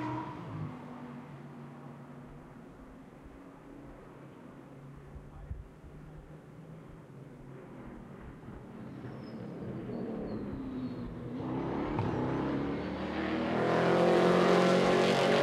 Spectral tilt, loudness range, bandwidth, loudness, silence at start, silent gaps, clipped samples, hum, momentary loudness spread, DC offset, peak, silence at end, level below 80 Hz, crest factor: -6.5 dB/octave; 21 LU; 13 kHz; -31 LUFS; 0 s; none; under 0.1%; none; 25 LU; under 0.1%; -14 dBFS; 0 s; -56 dBFS; 20 dB